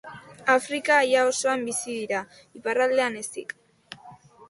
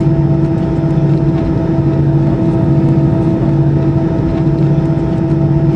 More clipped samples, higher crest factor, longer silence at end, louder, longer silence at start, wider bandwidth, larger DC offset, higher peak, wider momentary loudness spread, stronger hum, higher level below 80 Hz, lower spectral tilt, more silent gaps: neither; first, 18 dB vs 12 dB; about the same, 0.05 s vs 0 s; second, -24 LUFS vs -12 LUFS; about the same, 0.05 s vs 0 s; first, 11.5 kHz vs 5.8 kHz; neither; second, -8 dBFS vs 0 dBFS; first, 23 LU vs 2 LU; neither; second, -72 dBFS vs -26 dBFS; second, -2 dB/octave vs -10.5 dB/octave; neither